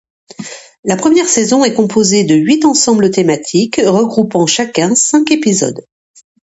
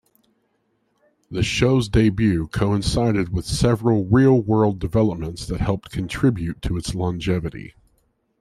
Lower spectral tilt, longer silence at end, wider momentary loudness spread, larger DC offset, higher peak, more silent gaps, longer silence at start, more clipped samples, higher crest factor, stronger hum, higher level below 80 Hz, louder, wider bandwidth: second, -4 dB/octave vs -6.5 dB/octave; about the same, 0.7 s vs 0.7 s; about the same, 11 LU vs 10 LU; neither; first, 0 dBFS vs -4 dBFS; first, 0.79-0.83 s vs none; second, 0.4 s vs 1.3 s; neither; second, 12 dB vs 18 dB; neither; second, -52 dBFS vs -36 dBFS; first, -11 LUFS vs -21 LUFS; second, 8.2 kHz vs 13.5 kHz